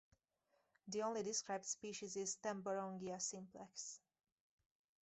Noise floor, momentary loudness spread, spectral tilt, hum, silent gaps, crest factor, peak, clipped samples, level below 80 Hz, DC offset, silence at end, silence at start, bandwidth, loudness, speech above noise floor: -84 dBFS; 11 LU; -3 dB/octave; none; none; 18 dB; -30 dBFS; under 0.1%; -88 dBFS; under 0.1%; 1.05 s; 0.85 s; 8.2 kHz; -46 LUFS; 38 dB